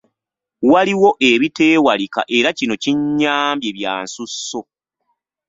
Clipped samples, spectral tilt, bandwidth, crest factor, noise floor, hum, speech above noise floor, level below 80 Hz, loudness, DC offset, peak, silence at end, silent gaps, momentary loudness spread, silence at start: under 0.1%; -4 dB/octave; 8 kHz; 16 dB; -83 dBFS; none; 67 dB; -60 dBFS; -16 LUFS; under 0.1%; -2 dBFS; 0.85 s; none; 12 LU; 0.6 s